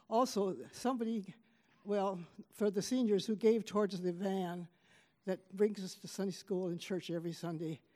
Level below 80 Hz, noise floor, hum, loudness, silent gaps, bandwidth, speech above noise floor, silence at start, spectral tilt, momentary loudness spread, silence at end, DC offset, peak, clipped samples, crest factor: -86 dBFS; -69 dBFS; none; -37 LUFS; none; 15.5 kHz; 33 dB; 0.1 s; -6 dB/octave; 12 LU; 0.2 s; under 0.1%; -18 dBFS; under 0.1%; 18 dB